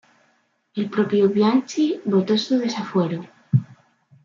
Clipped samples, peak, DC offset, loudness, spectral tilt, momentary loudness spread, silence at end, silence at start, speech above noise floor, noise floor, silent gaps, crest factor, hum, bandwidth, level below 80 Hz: under 0.1%; -6 dBFS; under 0.1%; -21 LUFS; -7 dB/octave; 8 LU; 0.5 s; 0.75 s; 45 dB; -65 dBFS; none; 16 dB; none; 7.4 kHz; -66 dBFS